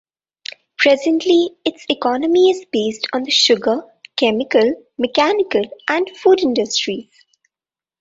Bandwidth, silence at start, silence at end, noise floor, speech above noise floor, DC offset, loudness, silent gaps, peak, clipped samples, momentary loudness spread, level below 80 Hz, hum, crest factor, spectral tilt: 7.8 kHz; 0.8 s; 1 s; under -90 dBFS; over 74 dB; under 0.1%; -16 LUFS; none; -2 dBFS; under 0.1%; 10 LU; -62 dBFS; none; 16 dB; -3 dB/octave